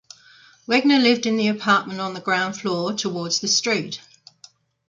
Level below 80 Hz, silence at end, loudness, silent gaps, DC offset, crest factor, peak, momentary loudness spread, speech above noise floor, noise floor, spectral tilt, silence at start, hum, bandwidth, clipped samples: -68 dBFS; 0.9 s; -20 LUFS; none; under 0.1%; 18 dB; -4 dBFS; 11 LU; 31 dB; -52 dBFS; -3 dB/octave; 0.7 s; none; 9 kHz; under 0.1%